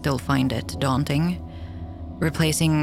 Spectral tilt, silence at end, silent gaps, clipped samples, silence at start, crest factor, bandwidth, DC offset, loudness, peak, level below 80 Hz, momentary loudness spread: -5.5 dB/octave; 0 s; none; under 0.1%; 0 s; 14 dB; 16 kHz; under 0.1%; -23 LUFS; -8 dBFS; -40 dBFS; 15 LU